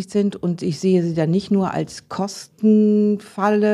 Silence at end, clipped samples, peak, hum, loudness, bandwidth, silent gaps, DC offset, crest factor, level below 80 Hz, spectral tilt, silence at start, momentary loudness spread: 0 s; under 0.1%; -6 dBFS; none; -20 LUFS; 11.5 kHz; none; under 0.1%; 14 dB; -60 dBFS; -7 dB/octave; 0 s; 11 LU